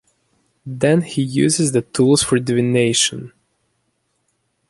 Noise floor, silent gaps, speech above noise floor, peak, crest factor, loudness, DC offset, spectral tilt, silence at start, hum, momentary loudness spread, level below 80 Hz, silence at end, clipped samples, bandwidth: -68 dBFS; none; 52 dB; -2 dBFS; 18 dB; -16 LUFS; under 0.1%; -4.5 dB/octave; 0.65 s; none; 9 LU; -54 dBFS; 1.4 s; under 0.1%; 12 kHz